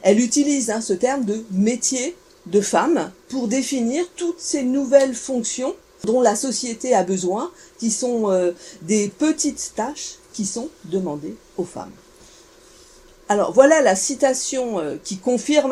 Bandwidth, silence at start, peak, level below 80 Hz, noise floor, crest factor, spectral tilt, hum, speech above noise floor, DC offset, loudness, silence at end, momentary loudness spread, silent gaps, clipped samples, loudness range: 15 kHz; 0 s; 0 dBFS; -58 dBFS; -48 dBFS; 20 dB; -4 dB/octave; none; 28 dB; under 0.1%; -20 LUFS; 0 s; 12 LU; none; under 0.1%; 6 LU